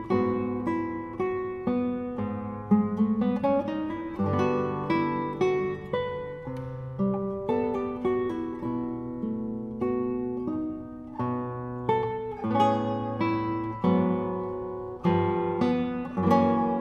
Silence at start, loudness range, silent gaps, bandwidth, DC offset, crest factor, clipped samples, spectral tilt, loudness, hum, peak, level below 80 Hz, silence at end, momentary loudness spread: 0 s; 4 LU; none; 7 kHz; under 0.1%; 18 dB; under 0.1%; -8.5 dB/octave; -28 LUFS; none; -8 dBFS; -54 dBFS; 0 s; 9 LU